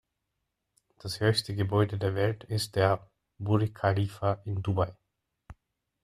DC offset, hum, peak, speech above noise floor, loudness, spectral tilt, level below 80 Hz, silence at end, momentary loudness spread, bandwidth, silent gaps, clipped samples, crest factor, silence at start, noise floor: under 0.1%; none; -10 dBFS; 54 dB; -29 LUFS; -6 dB/octave; -58 dBFS; 0.5 s; 7 LU; 14 kHz; none; under 0.1%; 20 dB; 1.05 s; -83 dBFS